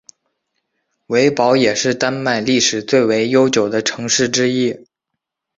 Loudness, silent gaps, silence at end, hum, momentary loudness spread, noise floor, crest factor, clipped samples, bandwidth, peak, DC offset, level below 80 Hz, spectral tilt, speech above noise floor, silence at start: -15 LUFS; none; 0.8 s; none; 6 LU; -79 dBFS; 16 dB; under 0.1%; 8 kHz; -2 dBFS; under 0.1%; -58 dBFS; -3.5 dB/octave; 64 dB; 1.1 s